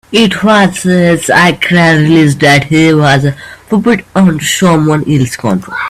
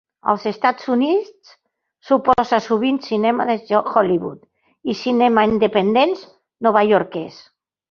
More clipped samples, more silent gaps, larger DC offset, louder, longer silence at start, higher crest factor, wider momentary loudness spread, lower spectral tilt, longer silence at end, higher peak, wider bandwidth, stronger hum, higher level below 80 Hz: first, 0.2% vs under 0.1%; neither; neither; first, -8 LUFS vs -18 LUFS; second, 0.1 s vs 0.25 s; second, 8 dB vs 18 dB; second, 6 LU vs 11 LU; about the same, -5.5 dB/octave vs -6.5 dB/octave; second, 0 s vs 0.6 s; about the same, 0 dBFS vs 0 dBFS; first, 14.5 kHz vs 6.8 kHz; neither; first, -42 dBFS vs -56 dBFS